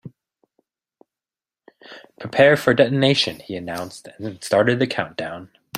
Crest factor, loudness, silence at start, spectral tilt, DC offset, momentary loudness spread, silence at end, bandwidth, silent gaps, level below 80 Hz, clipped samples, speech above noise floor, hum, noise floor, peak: 20 dB; -19 LUFS; 0.05 s; -5 dB/octave; under 0.1%; 18 LU; 0 s; 15 kHz; none; -62 dBFS; under 0.1%; over 70 dB; none; under -90 dBFS; -2 dBFS